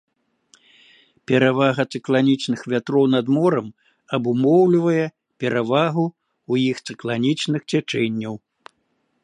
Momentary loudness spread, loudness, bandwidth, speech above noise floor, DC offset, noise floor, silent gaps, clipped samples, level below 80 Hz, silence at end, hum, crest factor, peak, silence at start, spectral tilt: 11 LU; -20 LUFS; 10.5 kHz; 50 dB; under 0.1%; -69 dBFS; none; under 0.1%; -68 dBFS; 0.85 s; none; 18 dB; -2 dBFS; 1.3 s; -6.5 dB/octave